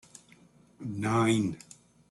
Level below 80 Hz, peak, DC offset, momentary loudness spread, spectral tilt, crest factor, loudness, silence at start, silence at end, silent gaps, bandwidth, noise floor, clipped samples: -66 dBFS; -14 dBFS; under 0.1%; 17 LU; -6 dB/octave; 18 dB; -29 LUFS; 0.8 s; 0.55 s; none; 12 kHz; -59 dBFS; under 0.1%